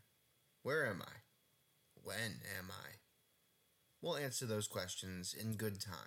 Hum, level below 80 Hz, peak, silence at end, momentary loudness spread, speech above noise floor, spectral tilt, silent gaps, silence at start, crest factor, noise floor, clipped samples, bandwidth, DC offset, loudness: none; -80 dBFS; -28 dBFS; 0 s; 16 LU; 33 dB; -3.5 dB/octave; none; 0.65 s; 18 dB; -77 dBFS; under 0.1%; 16.5 kHz; under 0.1%; -43 LUFS